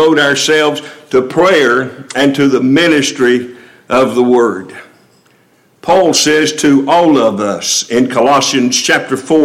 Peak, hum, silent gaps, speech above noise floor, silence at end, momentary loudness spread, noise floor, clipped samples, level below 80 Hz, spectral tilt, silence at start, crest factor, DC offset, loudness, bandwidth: 0 dBFS; none; none; 40 dB; 0 s; 6 LU; -50 dBFS; under 0.1%; -52 dBFS; -3.5 dB/octave; 0 s; 10 dB; under 0.1%; -10 LUFS; 16 kHz